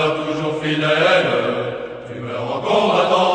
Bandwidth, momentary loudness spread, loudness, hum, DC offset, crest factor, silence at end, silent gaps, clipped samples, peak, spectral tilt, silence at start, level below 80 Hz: 9.2 kHz; 13 LU; -18 LUFS; none; under 0.1%; 16 dB; 0 s; none; under 0.1%; -2 dBFS; -5 dB/octave; 0 s; -56 dBFS